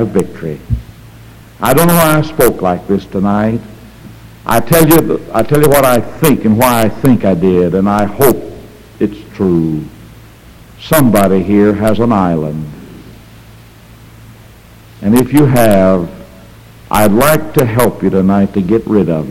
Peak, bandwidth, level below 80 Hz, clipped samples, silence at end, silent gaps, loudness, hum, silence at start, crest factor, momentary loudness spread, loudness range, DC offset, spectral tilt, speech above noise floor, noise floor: 0 dBFS; over 20 kHz; -34 dBFS; 0.2%; 0 s; none; -11 LUFS; none; 0 s; 12 dB; 13 LU; 5 LU; under 0.1%; -6 dB/octave; 28 dB; -37 dBFS